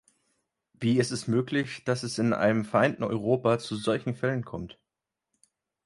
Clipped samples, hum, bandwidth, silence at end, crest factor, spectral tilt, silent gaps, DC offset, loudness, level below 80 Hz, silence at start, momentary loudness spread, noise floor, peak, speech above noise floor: under 0.1%; none; 11.5 kHz; 1.15 s; 20 dB; -6 dB/octave; none; under 0.1%; -27 LUFS; -62 dBFS; 0.8 s; 7 LU; -87 dBFS; -8 dBFS; 61 dB